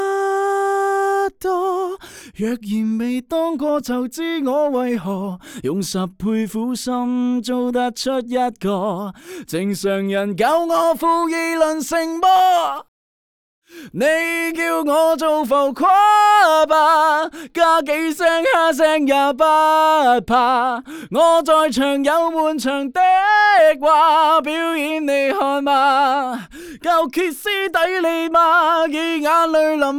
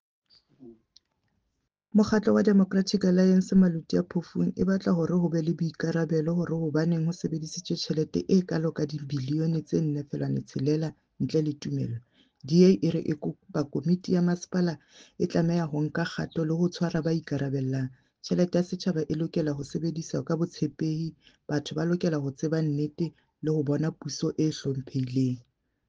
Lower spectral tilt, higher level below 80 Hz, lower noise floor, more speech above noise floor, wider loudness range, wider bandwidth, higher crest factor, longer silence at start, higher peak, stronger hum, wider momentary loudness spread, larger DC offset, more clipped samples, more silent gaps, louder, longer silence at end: second, -4 dB/octave vs -7 dB/octave; first, -56 dBFS vs -62 dBFS; first, under -90 dBFS vs -79 dBFS; first, over 73 dB vs 53 dB; about the same, 7 LU vs 5 LU; first, 18.5 kHz vs 7.6 kHz; second, 14 dB vs 20 dB; second, 0 s vs 0.6 s; first, -4 dBFS vs -8 dBFS; neither; about the same, 11 LU vs 10 LU; neither; neither; first, 12.88-13.62 s vs none; first, -17 LUFS vs -28 LUFS; second, 0 s vs 0.5 s